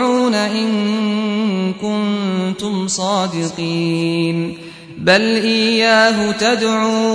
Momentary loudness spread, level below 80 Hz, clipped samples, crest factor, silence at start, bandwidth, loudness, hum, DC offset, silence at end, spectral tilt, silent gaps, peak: 8 LU; -56 dBFS; under 0.1%; 16 dB; 0 s; 10.5 kHz; -16 LUFS; none; under 0.1%; 0 s; -4.5 dB/octave; none; 0 dBFS